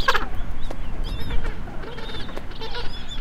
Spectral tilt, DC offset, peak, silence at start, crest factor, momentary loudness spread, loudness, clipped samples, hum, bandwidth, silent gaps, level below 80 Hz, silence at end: -4.5 dB/octave; under 0.1%; -2 dBFS; 0 s; 18 dB; 7 LU; -32 LUFS; under 0.1%; none; 8.2 kHz; none; -28 dBFS; 0 s